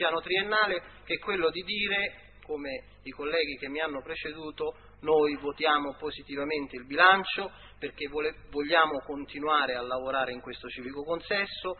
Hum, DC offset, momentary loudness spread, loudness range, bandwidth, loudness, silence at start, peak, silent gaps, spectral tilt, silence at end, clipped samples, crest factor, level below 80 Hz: none; under 0.1%; 14 LU; 5 LU; 4.5 kHz; -29 LUFS; 0 s; -6 dBFS; none; -7.5 dB/octave; 0 s; under 0.1%; 24 dB; -58 dBFS